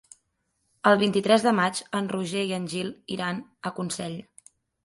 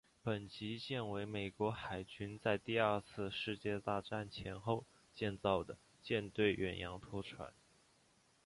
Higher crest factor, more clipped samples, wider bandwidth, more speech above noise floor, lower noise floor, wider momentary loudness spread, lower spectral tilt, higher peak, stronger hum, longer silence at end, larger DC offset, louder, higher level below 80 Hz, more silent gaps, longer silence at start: about the same, 22 dB vs 22 dB; neither; about the same, 11.5 kHz vs 11.5 kHz; first, 50 dB vs 32 dB; about the same, -75 dBFS vs -73 dBFS; about the same, 12 LU vs 11 LU; second, -4.5 dB/octave vs -6.5 dB/octave; first, -4 dBFS vs -20 dBFS; neither; second, 0.6 s vs 0.95 s; neither; first, -26 LUFS vs -41 LUFS; second, -70 dBFS vs -64 dBFS; neither; first, 0.85 s vs 0.25 s